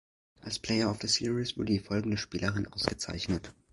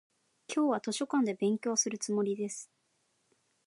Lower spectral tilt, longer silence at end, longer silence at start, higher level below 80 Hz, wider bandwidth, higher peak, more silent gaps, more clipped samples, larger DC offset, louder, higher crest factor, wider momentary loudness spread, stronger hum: about the same, -4.5 dB/octave vs -3.5 dB/octave; second, 0.2 s vs 1 s; about the same, 0.45 s vs 0.5 s; first, -52 dBFS vs -88 dBFS; about the same, 11.5 kHz vs 11.5 kHz; first, -10 dBFS vs -16 dBFS; neither; neither; neither; about the same, -32 LUFS vs -32 LUFS; first, 22 dB vs 16 dB; about the same, 8 LU vs 7 LU; neither